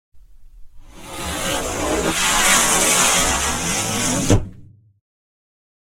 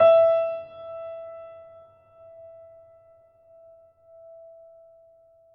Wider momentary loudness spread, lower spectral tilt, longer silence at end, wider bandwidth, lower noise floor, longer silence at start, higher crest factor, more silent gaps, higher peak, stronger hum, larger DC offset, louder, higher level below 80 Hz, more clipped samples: second, 12 LU vs 30 LU; second, -2 dB/octave vs -7 dB/octave; second, 1.25 s vs 4.1 s; first, 16.5 kHz vs 4.3 kHz; second, -44 dBFS vs -57 dBFS; first, 0.15 s vs 0 s; about the same, 20 dB vs 20 dB; neither; first, 0 dBFS vs -8 dBFS; neither; first, 0.4% vs under 0.1%; first, -17 LUFS vs -24 LUFS; first, -34 dBFS vs -76 dBFS; neither